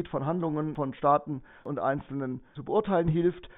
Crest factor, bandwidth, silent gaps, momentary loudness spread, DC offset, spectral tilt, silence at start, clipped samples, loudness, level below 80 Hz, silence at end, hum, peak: 18 dB; 4 kHz; none; 12 LU; under 0.1%; -7.5 dB/octave; 0 s; under 0.1%; -29 LUFS; -54 dBFS; 0.1 s; none; -12 dBFS